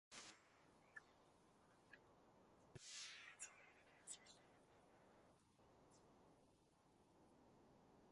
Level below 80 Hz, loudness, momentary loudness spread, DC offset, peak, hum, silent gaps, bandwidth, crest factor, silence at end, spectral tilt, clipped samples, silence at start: -88 dBFS; -60 LUFS; 14 LU; under 0.1%; -42 dBFS; none; none; 11.5 kHz; 26 dB; 0 s; -1.5 dB/octave; under 0.1%; 0.1 s